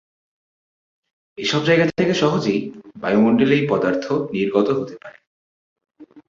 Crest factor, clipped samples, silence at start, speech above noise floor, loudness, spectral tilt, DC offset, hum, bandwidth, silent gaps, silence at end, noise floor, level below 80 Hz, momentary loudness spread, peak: 18 dB; under 0.1%; 1.4 s; over 71 dB; -19 LUFS; -6 dB/octave; under 0.1%; none; 7.6 kHz; 5.27-5.76 s; 0.1 s; under -90 dBFS; -60 dBFS; 10 LU; -4 dBFS